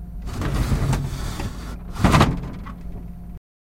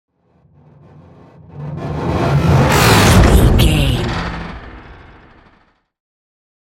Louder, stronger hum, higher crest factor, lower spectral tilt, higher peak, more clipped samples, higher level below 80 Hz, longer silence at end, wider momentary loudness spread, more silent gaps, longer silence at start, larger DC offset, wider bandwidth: second, -23 LUFS vs -13 LUFS; neither; about the same, 20 dB vs 16 dB; about the same, -6 dB/octave vs -5.5 dB/octave; about the same, -2 dBFS vs 0 dBFS; neither; second, -28 dBFS vs -22 dBFS; second, 0.35 s vs 1.85 s; about the same, 20 LU vs 19 LU; neither; second, 0 s vs 1.55 s; neither; about the same, 16.5 kHz vs 17 kHz